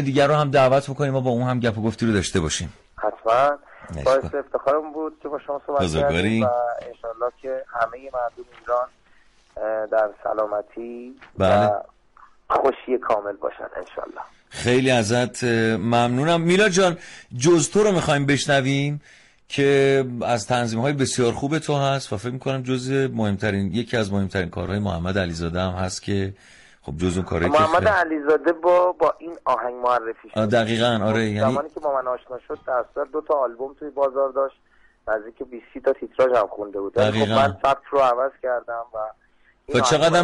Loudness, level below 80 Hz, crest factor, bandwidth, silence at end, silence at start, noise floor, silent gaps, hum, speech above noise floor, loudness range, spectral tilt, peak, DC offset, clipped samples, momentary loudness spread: -22 LUFS; -48 dBFS; 14 dB; 11.5 kHz; 0 s; 0 s; -55 dBFS; none; none; 33 dB; 6 LU; -5 dB/octave; -8 dBFS; under 0.1%; under 0.1%; 13 LU